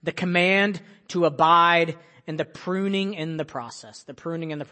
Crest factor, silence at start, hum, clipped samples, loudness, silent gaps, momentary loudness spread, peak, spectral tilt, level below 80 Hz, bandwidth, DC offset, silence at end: 20 dB; 0 s; none; under 0.1%; -22 LUFS; none; 20 LU; -4 dBFS; -5.5 dB/octave; -70 dBFS; 8.8 kHz; under 0.1%; 0.1 s